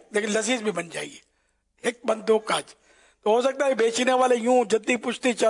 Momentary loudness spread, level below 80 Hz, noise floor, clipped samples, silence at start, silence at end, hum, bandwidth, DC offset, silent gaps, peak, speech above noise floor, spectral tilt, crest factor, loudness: 10 LU; -74 dBFS; -70 dBFS; under 0.1%; 0.15 s; 0 s; none; 11 kHz; under 0.1%; none; -10 dBFS; 47 dB; -3 dB/octave; 14 dB; -24 LUFS